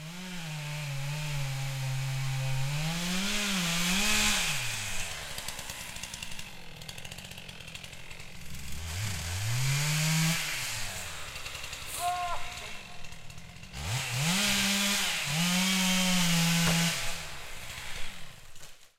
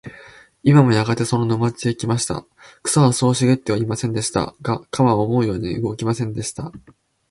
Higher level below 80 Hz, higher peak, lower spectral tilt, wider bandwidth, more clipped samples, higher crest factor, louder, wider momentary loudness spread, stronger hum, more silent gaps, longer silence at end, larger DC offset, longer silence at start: about the same, -46 dBFS vs -48 dBFS; second, -12 dBFS vs 0 dBFS; second, -3 dB/octave vs -6 dB/octave; first, 16 kHz vs 11.5 kHz; neither; about the same, 18 dB vs 18 dB; second, -30 LUFS vs -19 LUFS; first, 18 LU vs 11 LU; neither; neither; second, 0.1 s vs 0.5 s; neither; about the same, 0 s vs 0.05 s